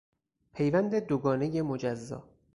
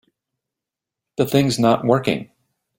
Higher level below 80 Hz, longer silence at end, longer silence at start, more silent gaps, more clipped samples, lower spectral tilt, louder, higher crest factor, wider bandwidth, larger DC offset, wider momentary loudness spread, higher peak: second, -62 dBFS vs -56 dBFS; second, 0.35 s vs 0.55 s; second, 0.55 s vs 1.2 s; neither; neither; first, -8 dB/octave vs -6 dB/octave; second, -30 LUFS vs -19 LUFS; about the same, 18 dB vs 20 dB; second, 11 kHz vs 16.5 kHz; neither; first, 15 LU vs 10 LU; second, -14 dBFS vs -2 dBFS